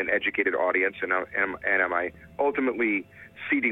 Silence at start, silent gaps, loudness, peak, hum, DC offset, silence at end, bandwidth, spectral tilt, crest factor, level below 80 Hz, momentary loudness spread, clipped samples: 0 s; none; -26 LUFS; -10 dBFS; none; under 0.1%; 0 s; 4 kHz; -7 dB/octave; 18 dB; -62 dBFS; 6 LU; under 0.1%